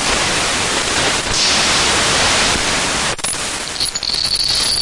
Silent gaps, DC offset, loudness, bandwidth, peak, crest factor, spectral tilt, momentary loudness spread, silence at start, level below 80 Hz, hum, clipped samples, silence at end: none; under 0.1%; -14 LUFS; 11.5 kHz; -4 dBFS; 12 dB; -1 dB/octave; 6 LU; 0 s; -34 dBFS; none; under 0.1%; 0 s